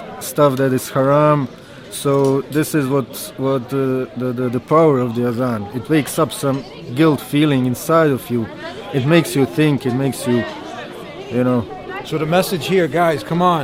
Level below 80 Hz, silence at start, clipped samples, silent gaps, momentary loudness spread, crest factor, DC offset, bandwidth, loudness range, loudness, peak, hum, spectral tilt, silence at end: -52 dBFS; 0 s; under 0.1%; none; 12 LU; 16 dB; under 0.1%; 16.5 kHz; 2 LU; -17 LUFS; 0 dBFS; none; -6 dB/octave; 0 s